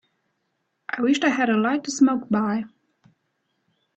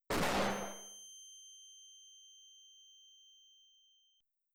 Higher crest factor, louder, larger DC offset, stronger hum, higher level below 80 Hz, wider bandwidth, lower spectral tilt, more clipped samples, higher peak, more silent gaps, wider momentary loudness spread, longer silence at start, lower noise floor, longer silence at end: about the same, 18 dB vs 16 dB; first, -22 LUFS vs -39 LUFS; neither; neither; second, -68 dBFS vs -60 dBFS; second, 8.6 kHz vs over 20 kHz; about the same, -4.5 dB/octave vs -3.5 dB/octave; neither; first, -6 dBFS vs -26 dBFS; neither; second, 12 LU vs 25 LU; first, 0.9 s vs 0.1 s; about the same, -75 dBFS vs -78 dBFS; second, 1.3 s vs 2.05 s